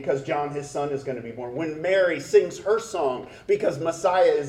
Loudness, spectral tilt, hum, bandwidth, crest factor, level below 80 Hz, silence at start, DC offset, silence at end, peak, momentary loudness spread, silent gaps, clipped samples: -25 LUFS; -5 dB/octave; none; 12.5 kHz; 18 dB; -60 dBFS; 0 s; under 0.1%; 0 s; -6 dBFS; 10 LU; none; under 0.1%